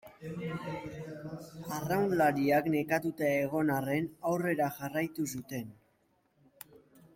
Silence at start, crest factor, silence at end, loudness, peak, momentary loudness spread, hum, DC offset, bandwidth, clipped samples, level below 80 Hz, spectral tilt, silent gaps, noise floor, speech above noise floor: 0.05 s; 18 dB; 1.45 s; -32 LUFS; -16 dBFS; 16 LU; none; under 0.1%; 16.5 kHz; under 0.1%; -68 dBFS; -6 dB/octave; none; -72 dBFS; 40 dB